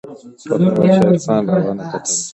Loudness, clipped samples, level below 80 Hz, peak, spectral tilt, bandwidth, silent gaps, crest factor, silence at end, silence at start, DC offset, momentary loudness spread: -15 LUFS; under 0.1%; -54 dBFS; 0 dBFS; -6 dB/octave; 8.8 kHz; none; 14 dB; 0 s; 0.05 s; under 0.1%; 10 LU